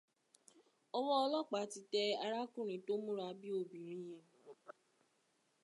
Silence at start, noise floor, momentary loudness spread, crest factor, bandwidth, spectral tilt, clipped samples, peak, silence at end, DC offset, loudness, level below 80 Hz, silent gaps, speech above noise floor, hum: 0.95 s; -79 dBFS; 22 LU; 20 dB; 11.5 kHz; -4 dB/octave; under 0.1%; -24 dBFS; 0.95 s; under 0.1%; -41 LUFS; under -90 dBFS; none; 39 dB; none